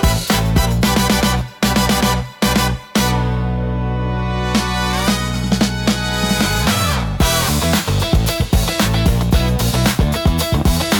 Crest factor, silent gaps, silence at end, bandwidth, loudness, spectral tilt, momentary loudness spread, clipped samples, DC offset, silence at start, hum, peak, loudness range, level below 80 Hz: 14 dB; none; 0 s; 19 kHz; -16 LUFS; -4.5 dB/octave; 4 LU; under 0.1%; under 0.1%; 0 s; none; -2 dBFS; 2 LU; -22 dBFS